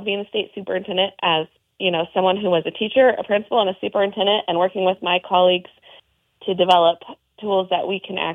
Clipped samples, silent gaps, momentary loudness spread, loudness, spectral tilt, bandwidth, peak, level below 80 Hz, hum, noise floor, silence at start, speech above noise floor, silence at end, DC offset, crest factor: under 0.1%; none; 10 LU; -20 LUFS; -6 dB/octave; 7.2 kHz; -2 dBFS; -68 dBFS; none; -52 dBFS; 0 s; 33 dB; 0 s; under 0.1%; 18 dB